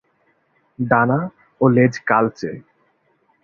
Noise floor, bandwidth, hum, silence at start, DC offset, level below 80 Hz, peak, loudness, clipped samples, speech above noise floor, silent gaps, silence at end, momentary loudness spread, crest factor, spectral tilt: -63 dBFS; 7 kHz; none; 0.8 s; under 0.1%; -58 dBFS; -2 dBFS; -18 LUFS; under 0.1%; 46 dB; none; 0.85 s; 15 LU; 18 dB; -8 dB/octave